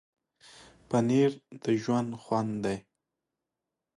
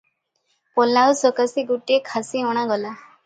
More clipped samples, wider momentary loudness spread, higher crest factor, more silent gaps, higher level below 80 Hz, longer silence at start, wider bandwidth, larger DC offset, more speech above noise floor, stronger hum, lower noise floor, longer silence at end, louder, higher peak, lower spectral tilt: neither; about the same, 9 LU vs 10 LU; about the same, 16 dB vs 16 dB; neither; first, -66 dBFS vs -74 dBFS; first, 0.9 s vs 0.75 s; first, 11.5 kHz vs 9.4 kHz; neither; first, 59 dB vs 50 dB; neither; first, -88 dBFS vs -70 dBFS; first, 1.2 s vs 0.3 s; second, -29 LUFS vs -20 LUFS; second, -14 dBFS vs -4 dBFS; first, -7 dB/octave vs -3 dB/octave